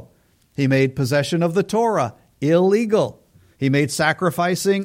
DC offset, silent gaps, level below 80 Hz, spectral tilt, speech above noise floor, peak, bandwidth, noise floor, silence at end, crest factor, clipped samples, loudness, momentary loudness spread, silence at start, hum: under 0.1%; none; -58 dBFS; -6 dB/octave; 40 dB; -4 dBFS; 16.5 kHz; -58 dBFS; 0 s; 16 dB; under 0.1%; -19 LUFS; 8 LU; 0 s; none